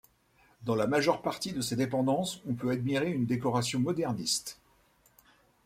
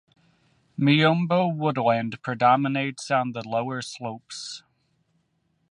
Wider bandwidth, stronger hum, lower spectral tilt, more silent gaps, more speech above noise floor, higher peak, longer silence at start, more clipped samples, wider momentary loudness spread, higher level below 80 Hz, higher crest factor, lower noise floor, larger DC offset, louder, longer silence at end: first, 16 kHz vs 11 kHz; neither; about the same, -5 dB/octave vs -6 dB/octave; neither; second, 36 dB vs 47 dB; second, -10 dBFS vs -6 dBFS; second, 0.6 s vs 0.8 s; neither; second, 6 LU vs 16 LU; first, -64 dBFS vs -70 dBFS; about the same, 22 dB vs 20 dB; second, -66 dBFS vs -71 dBFS; neither; second, -31 LUFS vs -23 LUFS; about the same, 1.15 s vs 1.1 s